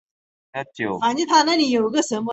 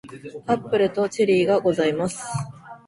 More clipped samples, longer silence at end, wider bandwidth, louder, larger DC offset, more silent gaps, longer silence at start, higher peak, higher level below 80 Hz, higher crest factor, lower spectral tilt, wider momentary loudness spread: neither; about the same, 0 s vs 0.1 s; second, 8.2 kHz vs 11.5 kHz; first, -19 LUFS vs -22 LUFS; neither; neither; first, 0.55 s vs 0.05 s; about the same, -4 dBFS vs -6 dBFS; second, -66 dBFS vs -58 dBFS; about the same, 18 dB vs 16 dB; second, -3 dB/octave vs -5.5 dB/octave; about the same, 16 LU vs 15 LU